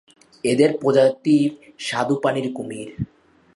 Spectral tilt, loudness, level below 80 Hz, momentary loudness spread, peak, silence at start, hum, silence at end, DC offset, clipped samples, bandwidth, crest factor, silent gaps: -6 dB/octave; -20 LUFS; -58 dBFS; 15 LU; -4 dBFS; 0.45 s; none; 0.5 s; under 0.1%; under 0.1%; 11.5 kHz; 18 dB; none